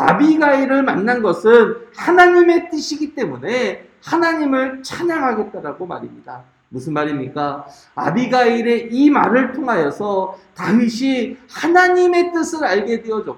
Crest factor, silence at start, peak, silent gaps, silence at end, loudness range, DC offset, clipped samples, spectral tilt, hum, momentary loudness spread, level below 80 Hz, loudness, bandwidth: 16 dB; 0 s; 0 dBFS; none; 0.05 s; 8 LU; under 0.1%; under 0.1%; -5.5 dB/octave; none; 15 LU; -60 dBFS; -16 LUFS; 11.5 kHz